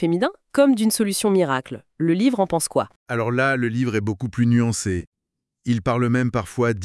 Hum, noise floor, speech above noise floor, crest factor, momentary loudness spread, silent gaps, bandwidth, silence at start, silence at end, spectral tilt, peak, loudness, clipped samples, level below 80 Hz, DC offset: none; -82 dBFS; 62 dB; 16 dB; 8 LU; 2.96-3.06 s, 5.07-5.12 s; 12 kHz; 0 s; 0 s; -5.5 dB/octave; -4 dBFS; -21 LUFS; under 0.1%; -54 dBFS; under 0.1%